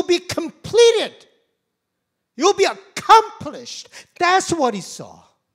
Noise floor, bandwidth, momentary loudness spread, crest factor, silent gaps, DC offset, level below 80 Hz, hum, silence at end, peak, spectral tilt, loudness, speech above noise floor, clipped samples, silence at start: -77 dBFS; 15.5 kHz; 20 LU; 20 dB; none; under 0.1%; -58 dBFS; none; 0.5 s; 0 dBFS; -3 dB/octave; -17 LUFS; 56 dB; under 0.1%; 0 s